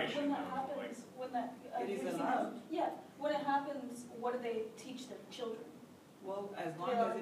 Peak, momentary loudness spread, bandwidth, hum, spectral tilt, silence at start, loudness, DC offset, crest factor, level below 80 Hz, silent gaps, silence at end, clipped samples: -22 dBFS; 13 LU; 15.5 kHz; none; -5 dB/octave; 0 s; -40 LUFS; under 0.1%; 18 dB; under -90 dBFS; none; 0 s; under 0.1%